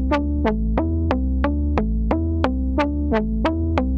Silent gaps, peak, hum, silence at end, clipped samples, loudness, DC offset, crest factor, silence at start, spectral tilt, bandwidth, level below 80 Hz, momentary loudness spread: none; -2 dBFS; none; 0 s; under 0.1%; -22 LUFS; under 0.1%; 18 dB; 0 s; -9 dB/octave; 6.4 kHz; -24 dBFS; 1 LU